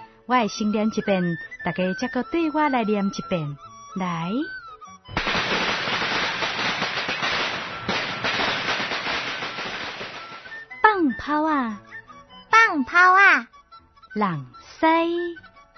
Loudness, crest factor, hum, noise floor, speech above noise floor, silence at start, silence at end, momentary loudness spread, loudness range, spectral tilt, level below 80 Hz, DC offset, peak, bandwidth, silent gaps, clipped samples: -22 LUFS; 22 dB; none; -50 dBFS; 28 dB; 0 s; 0.15 s; 18 LU; 7 LU; -4.5 dB/octave; -54 dBFS; under 0.1%; 0 dBFS; 6.4 kHz; none; under 0.1%